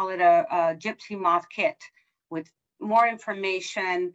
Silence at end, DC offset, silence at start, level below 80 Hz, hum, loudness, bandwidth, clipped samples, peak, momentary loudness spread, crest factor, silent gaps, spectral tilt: 0.05 s; under 0.1%; 0 s; -78 dBFS; none; -24 LUFS; 8 kHz; under 0.1%; -8 dBFS; 17 LU; 18 dB; none; -4.5 dB/octave